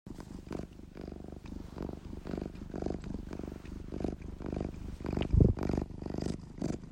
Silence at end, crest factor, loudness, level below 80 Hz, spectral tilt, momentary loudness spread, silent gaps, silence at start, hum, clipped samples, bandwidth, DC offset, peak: 0 s; 26 dB; -37 LUFS; -42 dBFS; -8 dB/octave; 17 LU; none; 0.05 s; none; under 0.1%; 10.5 kHz; under 0.1%; -10 dBFS